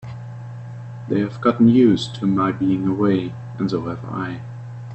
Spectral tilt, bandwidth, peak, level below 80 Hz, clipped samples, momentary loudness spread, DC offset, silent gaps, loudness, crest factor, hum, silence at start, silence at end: -8 dB/octave; 8.4 kHz; -4 dBFS; -54 dBFS; under 0.1%; 20 LU; under 0.1%; none; -20 LUFS; 16 dB; none; 0 s; 0 s